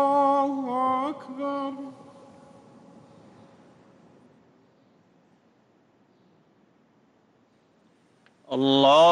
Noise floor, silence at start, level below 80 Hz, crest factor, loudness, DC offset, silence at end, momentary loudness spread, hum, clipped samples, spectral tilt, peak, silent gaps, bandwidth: -63 dBFS; 0 s; -78 dBFS; 20 dB; -24 LUFS; under 0.1%; 0 s; 19 LU; none; under 0.1%; -5 dB/octave; -8 dBFS; none; 9.8 kHz